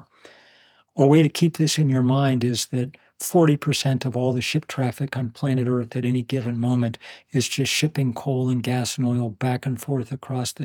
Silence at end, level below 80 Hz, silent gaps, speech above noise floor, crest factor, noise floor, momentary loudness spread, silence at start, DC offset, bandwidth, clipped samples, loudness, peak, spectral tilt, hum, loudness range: 0 s; -68 dBFS; none; 35 dB; 18 dB; -56 dBFS; 9 LU; 0.95 s; under 0.1%; 19.5 kHz; under 0.1%; -23 LUFS; -4 dBFS; -5.5 dB/octave; none; 4 LU